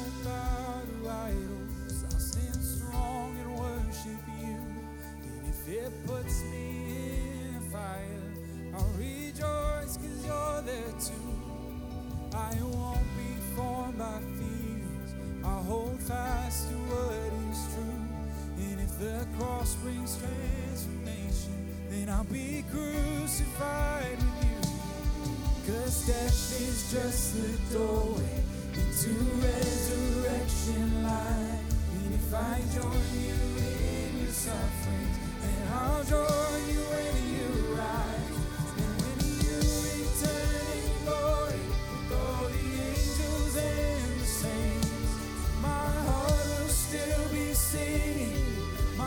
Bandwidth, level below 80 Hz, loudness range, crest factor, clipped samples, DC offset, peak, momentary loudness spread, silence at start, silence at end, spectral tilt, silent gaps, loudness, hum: 19.5 kHz; -36 dBFS; 6 LU; 18 dB; under 0.1%; under 0.1%; -14 dBFS; 8 LU; 0 s; 0 s; -5 dB/octave; none; -33 LUFS; none